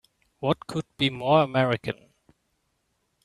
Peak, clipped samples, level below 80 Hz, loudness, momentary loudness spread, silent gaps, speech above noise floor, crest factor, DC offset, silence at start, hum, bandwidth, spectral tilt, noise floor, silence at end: -8 dBFS; under 0.1%; -62 dBFS; -25 LUFS; 13 LU; none; 49 dB; 20 dB; under 0.1%; 0.4 s; none; 12 kHz; -6.5 dB/octave; -74 dBFS; 1.3 s